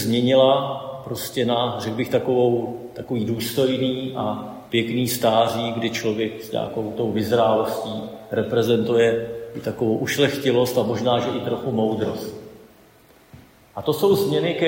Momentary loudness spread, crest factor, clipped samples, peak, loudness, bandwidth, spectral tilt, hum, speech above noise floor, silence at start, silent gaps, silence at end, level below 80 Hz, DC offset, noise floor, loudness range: 11 LU; 18 dB; under 0.1%; -4 dBFS; -22 LUFS; 16.5 kHz; -5.5 dB/octave; none; 31 dB; 0 s; none; 0 s; -58 dBFS; under 0.1%; -52 dBFS; 3 LU